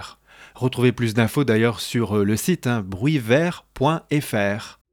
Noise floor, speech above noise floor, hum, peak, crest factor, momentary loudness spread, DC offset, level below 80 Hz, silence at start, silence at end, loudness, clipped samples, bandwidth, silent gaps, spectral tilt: -47 dBFS; 26 dB; none; -4 dBFS; 16 dB; 7 LU; under 0.1%; -54 dBFS; 0 s; 0.2 s; -21 LUFS; under 0.1%; 19 kHz; none; -6 dB/octave